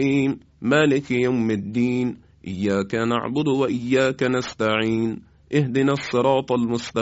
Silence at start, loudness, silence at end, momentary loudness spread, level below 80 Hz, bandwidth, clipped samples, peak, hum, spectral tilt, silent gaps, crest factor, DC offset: 0 s; -22 LUFS; 0 s; 6 LU; -54 dBFS; 8 kHz; under 0.1%; -6 dBFS; none; -6.5 dB/octave; none; 16 dB; under 0.1%